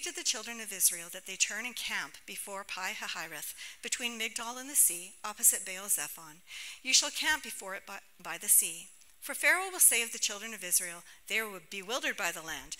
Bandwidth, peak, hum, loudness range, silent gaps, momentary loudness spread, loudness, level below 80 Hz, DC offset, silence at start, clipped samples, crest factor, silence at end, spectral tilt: 16 kHz; -8 dBFS; none; 6 LU; none; 17 LU; -30 LUFS; -70 dBFS; under 0.1%; 0 s; under 0.1%; 26 dB; 0.05 s; 1.5 dB/octave